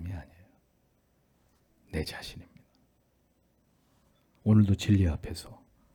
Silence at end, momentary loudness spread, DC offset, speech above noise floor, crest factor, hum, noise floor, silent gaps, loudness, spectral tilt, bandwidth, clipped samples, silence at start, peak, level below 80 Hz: 0.4 s; 21 LU; under 0.1%; 43 dB; 20 dB; none; -70 dBFS; none; -28 LUFS; -7 dB/octave; 15.5 kHz; under 0.1%; 0 s; -12 dBFS; -50 dBFS